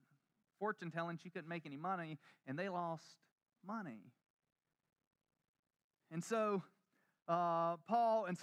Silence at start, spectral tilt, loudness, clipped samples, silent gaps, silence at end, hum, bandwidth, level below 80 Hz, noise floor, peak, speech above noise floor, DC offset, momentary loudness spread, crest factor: 0.6 s; -6 dB/octave; -42 LUFS; under 0.1%; 3.32-3.36 s, 4.30-4.37 s, 4.52-4.56 s, 5.07-5.11 s, 5.49-5.63 s, 5.84-5.90 s; 0 s; none; 12.5 kHz; under -90 dBFS; -82 dBFS; -24 dBFS; 40 dB; under 0.1%; 15 LU; 18 dB